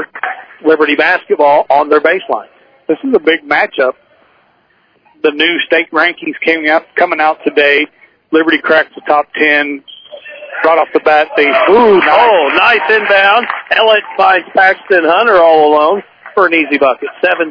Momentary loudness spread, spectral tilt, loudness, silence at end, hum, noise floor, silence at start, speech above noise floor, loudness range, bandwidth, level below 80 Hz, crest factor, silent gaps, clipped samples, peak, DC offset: 10 LU; -5.5 dB/octave; -10 LUFS; 0 s; none; -53 dBFS; 0 s; 43 dB; 5 LU; 5.4 kHz; -56 dBFS; 10 dB; none; 0.5%; 0 dBFS; under 0.1%